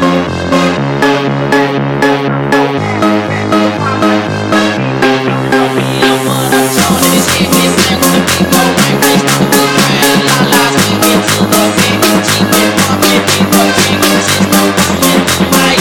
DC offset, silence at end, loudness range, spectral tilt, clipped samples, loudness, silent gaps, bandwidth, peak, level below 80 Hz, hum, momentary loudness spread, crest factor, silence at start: 0.3%; 0 s; 3 LU; -4 dB/octave; under 0.1%; -9 LUFS; none; 19.5 kHz; 0 dBFS; -38 dBFS; none; 4 LU; 10 dB; 0 s